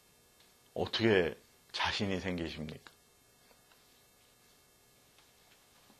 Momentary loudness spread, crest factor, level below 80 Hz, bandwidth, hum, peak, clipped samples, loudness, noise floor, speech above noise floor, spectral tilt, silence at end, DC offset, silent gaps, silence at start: 17 LU; 24 dB; -62 dBFS; 13.5 kHz; none; -14 dBFS; under 0.1%; -34 LUFS; -66 dBFS; 32 dB; -5 dB/octave; 3.2 s; under 0.1%; none; 0.75 s